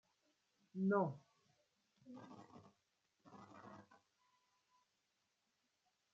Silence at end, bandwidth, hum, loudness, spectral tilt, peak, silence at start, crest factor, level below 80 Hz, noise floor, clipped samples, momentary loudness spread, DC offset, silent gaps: 2.35 s; 7.2 kHz; none; -41 LUFS; -8.5 dB/octave; -24 dBFS; 0.75 s; 26 dB; under -90 dBFS; -86 dBFS; under 0.1%; 25 LU; under 0.1%; none